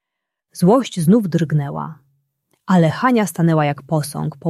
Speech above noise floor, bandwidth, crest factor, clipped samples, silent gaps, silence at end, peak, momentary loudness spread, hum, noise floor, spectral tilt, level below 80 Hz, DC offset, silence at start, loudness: 64 dB; 13 kHz; 16 dB; under 0.1%; none; 0 s; -2 dBFS; 11 LU; none; -81 dBFS; -7 dB/octave; -58 dBFS; under 0.1%; 0.55 s; -17 LUFS